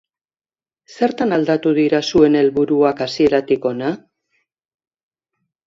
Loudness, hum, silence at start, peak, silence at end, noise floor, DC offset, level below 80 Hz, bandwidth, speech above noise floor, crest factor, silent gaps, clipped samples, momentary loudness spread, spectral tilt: -16 LUFS; none; 0.9 s; 0 dBFS; 1.7 s; under -90 dBFS; under 0.1%; -54 dBFS; 7.6 kHz; over 74 dB; 18 dB; none; under 0.1%; 8 LU; -6 dB/octave